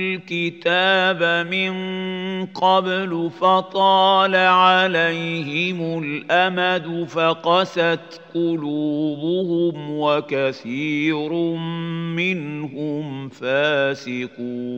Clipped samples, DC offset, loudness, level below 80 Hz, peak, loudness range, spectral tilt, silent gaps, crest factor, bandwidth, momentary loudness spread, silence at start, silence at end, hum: under 0.1%; under 0.1%; -20 LUFS; -74 dBFS; -2 dBFS; 6 LU; -6 dB/octave; none; 18 dB; 8 kHz; 11 LU; 0 s; 0 s; none